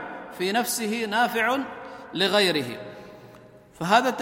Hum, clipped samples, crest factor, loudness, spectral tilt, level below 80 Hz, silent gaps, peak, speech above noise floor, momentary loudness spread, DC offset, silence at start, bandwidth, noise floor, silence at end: none; under 0.1%; 22 dB; -24 LUFS; -3 dB/octave; -66 dBFS; none; -4 dBFS; 26 dB; 17 LU; under 0.1%; 0 s; 16.5 kHz; -49 dBFS; 0 s